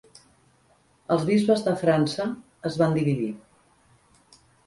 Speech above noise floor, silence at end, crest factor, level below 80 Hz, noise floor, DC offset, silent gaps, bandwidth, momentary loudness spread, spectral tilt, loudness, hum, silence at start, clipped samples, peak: 39 dB; 1.3 s; 18 dB; -62 dBFS; -62 dBFS; under 0.1%; none; 11.5 kHz; 12 LU; -7 dB/octave; -24 LUFS; none; 1.1 s; under 0.1%; -8 dBFS